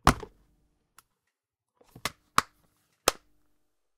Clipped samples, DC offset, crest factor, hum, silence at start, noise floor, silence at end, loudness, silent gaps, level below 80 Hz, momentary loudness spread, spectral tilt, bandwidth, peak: under 0.1%; under 0.1%; 30 dB; none; 0.05 s; -84 dBFS; 0.85 s; -30 LUFS; none; -44 dBFS; 21 LU; -3 dB/octave; 16 kHz; -4 dBFS